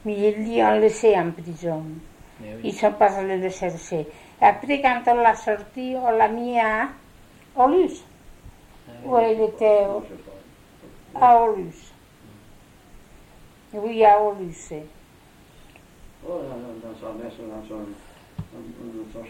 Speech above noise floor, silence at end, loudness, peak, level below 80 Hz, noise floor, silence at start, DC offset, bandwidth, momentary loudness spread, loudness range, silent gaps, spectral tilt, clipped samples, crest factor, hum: 30 dB; 0 s; -21 LUFS; -4 dBFS; -52 dBFS; -51 dBFS; 0.05 s; under 0.1%; 15.5 kHz; 21 LU; 15 LU; none; -5.5 dB/octave; under 0.1%; 18 dB; none